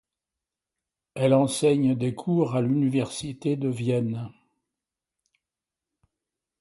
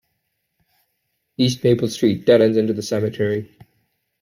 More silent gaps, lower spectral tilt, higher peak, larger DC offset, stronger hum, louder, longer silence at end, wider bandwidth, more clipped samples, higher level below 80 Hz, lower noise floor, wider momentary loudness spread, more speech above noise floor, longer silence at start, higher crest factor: neither; about the same, -6.5 dB/octave vs -6 dB/octave; second, -8 dBFS vs -4 dBFS; neither; neither; second, -25 LUFS vs -19 LUFS; first, 2.3 s vs 0.75 s; second, 11.5 kHz vs 16 kHz; neither; about the same, -64 dBFS vs -60 dBFS; first, -89 dBFS vs -73 dBFS; about the same, 10 LU vs 8 LU; first, 65 dB vs 55 dB; second, 1.15 s vs 1.4 s; about the same, 20 dB vs 18 dB